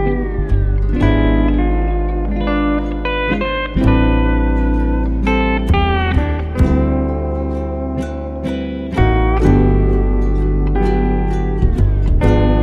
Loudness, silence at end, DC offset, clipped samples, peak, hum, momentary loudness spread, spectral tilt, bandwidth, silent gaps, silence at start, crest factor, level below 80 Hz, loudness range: -16 LUFS; 0 s; under 0.1%; under 0.1%; 0 dBFS; none; 7 LU; -8.5 dB/octave; 4.7 kHz; none; 0 s; 14 dB; -16 dBFS; 2 LU